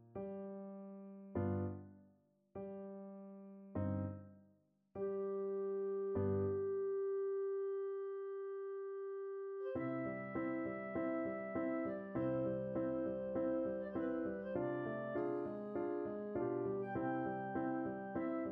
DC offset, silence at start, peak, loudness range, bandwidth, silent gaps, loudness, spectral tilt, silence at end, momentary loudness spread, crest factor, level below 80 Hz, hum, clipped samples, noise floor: under 0.1%; 0 s; -26 dBFS; 6 LU; 3.7 kHz; none; -42 LUFS; -9 dB/octave; 0 s; 11 LU; 16 dB; -72 dBFS; none; under 0.1%; -74 dBFS